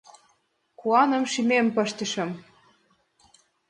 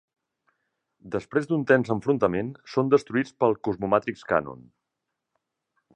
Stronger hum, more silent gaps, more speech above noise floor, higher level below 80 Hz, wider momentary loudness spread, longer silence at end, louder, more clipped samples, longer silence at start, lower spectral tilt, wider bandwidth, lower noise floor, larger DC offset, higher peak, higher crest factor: neither; neither; second, 46 dB vs 59 dB; second, -74 dBFS vs -60 dBFS; first, 13 LU vs 8 LU; about the same, 1.3 s vs 1.35 s; about the same, -24 LUFS vs -25 LUFS; neither; second, 0.8 s vs 1.05 s; second, -4 dB/octave vs -7.5 dB/octave; first, 10.5 kHz vs 9.4 kHz; second, -69 dBFS vs -83 dBFS; neither; about the same, -6 dBFS vs -6 dBFS; about the same, 20 dB vs 22 dB